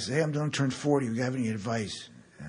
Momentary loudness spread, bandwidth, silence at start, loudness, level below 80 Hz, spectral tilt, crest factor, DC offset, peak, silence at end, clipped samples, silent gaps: 10 LU; 11 kHz; 0 s; -30 LUFS; -66 dBFS; -5.5 dB/octave; 16 dB; under 0.1%; -14 dBFS; 0 s; under 0.1%; none